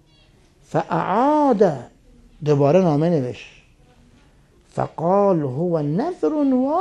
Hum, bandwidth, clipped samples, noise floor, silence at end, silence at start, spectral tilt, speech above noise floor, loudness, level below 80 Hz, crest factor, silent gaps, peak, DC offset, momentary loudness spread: none; 9.8 kHz; under 0.1%; -54 dBFS; 0 s; 0.7 s; -8.5 dB/octave; 35 dB; -19 LUFS; -56 dBFS; 18 dB; none; -4 dBFS; under 0.1%; 12 LU